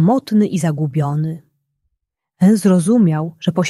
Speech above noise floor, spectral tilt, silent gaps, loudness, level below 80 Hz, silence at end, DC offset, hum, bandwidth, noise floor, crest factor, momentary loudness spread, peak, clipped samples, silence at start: 61 dB; -7 dB/octave; none; -16 LUFS; -60 dBFS; 0 s; under 0.1%; none; 13 kHz; -76 dBFS; 14 dB; 8 LU; -2 dBFS; under 0.1%; 0 s